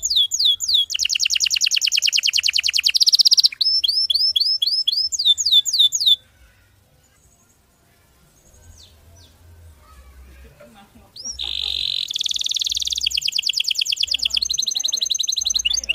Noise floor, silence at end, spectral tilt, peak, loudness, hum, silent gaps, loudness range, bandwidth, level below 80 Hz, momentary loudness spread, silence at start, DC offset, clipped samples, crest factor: -57 dBFS; 0 s; 3.5 dB/octave; -2 dBFS; -16 LUFS; none; none; 11 LU; 16 kHz; -52 dBFS; 8 LU; 0 s; under 0.1%; under 0.1%; 20 dB